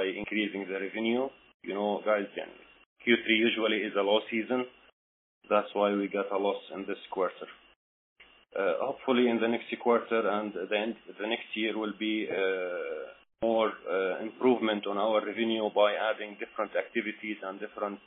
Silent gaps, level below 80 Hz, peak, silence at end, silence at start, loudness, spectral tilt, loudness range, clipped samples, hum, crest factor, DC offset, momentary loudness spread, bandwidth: 1.54-1.60 s, 2.86-2.96 s, 4.92-5.41 s, 7.76-8.16 s; -76 dBFS; -10 dBFS; 0.1 s; 0 s; -30 LUFS; -2 dB/octave; 4 LU; under 0.1%; none; 20 dB; under 0.1%; 12 LU; 4 kHz